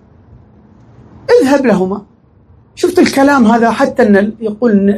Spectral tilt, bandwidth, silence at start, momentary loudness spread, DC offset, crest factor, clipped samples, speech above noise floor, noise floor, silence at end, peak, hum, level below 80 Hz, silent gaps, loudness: -6 dB/octave; 14 kHz; 1.3 s; 9 LU; under 0.1%; 12 dB; 0.3%; 35 dB; -45 dBFS; 0 s; 0 dBFS; none; -46 dBFS; none; -10 LUFS